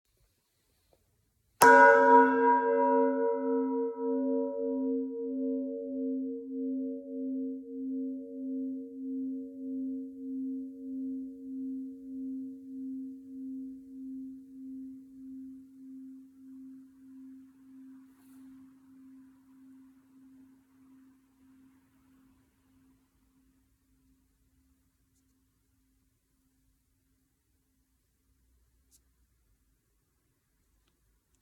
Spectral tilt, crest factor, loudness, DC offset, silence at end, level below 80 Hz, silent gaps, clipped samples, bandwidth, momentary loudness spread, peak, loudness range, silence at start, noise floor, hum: -4 dB/octave; 28 dB; -29 LUFS; under 0.1%; 12.2 s; -76 dBFS; none; under 0.1%; 17.5 kHz; 25 LU; -6 dBFS; 25 LU; 1.6 s; -75 dBFS; none